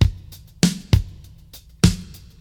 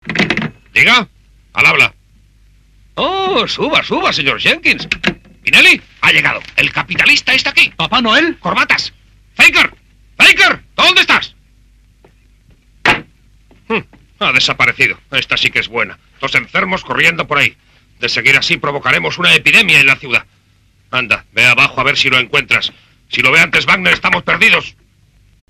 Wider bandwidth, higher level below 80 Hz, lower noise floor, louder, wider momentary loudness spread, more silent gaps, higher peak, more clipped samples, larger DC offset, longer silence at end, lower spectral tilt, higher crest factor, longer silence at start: about the same, 19 kHz vs over 20 kHz; first, -30 dBFS vs -44 dBFS; second, -45 dBFS vs -52 dBFS; second, -21 LUFS vs -10 LUFS; first, 20 LU vs 12 LU; neither; about the same, 0 dBFS vs 0 dBFS; second, under 0.1% vs 0.3%; neither; second, 0.35 s vs 0.8 s; first, -5.5 dB/octave vs -2.5 dB/octave; first, 22 dB vs 14 dB; about the same, 0 s vs 0.05 s